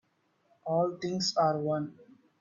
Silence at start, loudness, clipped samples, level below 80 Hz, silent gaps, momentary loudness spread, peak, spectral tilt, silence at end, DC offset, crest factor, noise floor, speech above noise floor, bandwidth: 0.65 s; -30 LUFS; under 0.1%; -76 dBFS; none; 11 LU; -16 dBFS; -5 dB/octave; 0.4 s; under 0.1%; 16 dB; -72 dBFS; 42 dB; 7.6 kHz